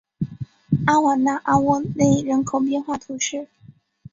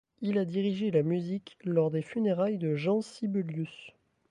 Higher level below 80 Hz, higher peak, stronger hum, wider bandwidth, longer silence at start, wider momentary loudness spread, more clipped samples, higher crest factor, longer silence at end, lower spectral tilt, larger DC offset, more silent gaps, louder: first, -52 dBFS vs -76 dBFS; first, -4 dBFS vs -14 dBFS; neither; second, 7.8 kHz vs 10.5 kHz; about the same, 0.2 s vs 0.2 s; first, 13 LU vs 8 LU; neither; about the same, 18 dB vs 16 dB; first, 0.7 s vs 0.4 s; second, -5.5 dB/octave vs -8 dB/octave; neither; neither; first, -21 LUFS vs -31 LUFS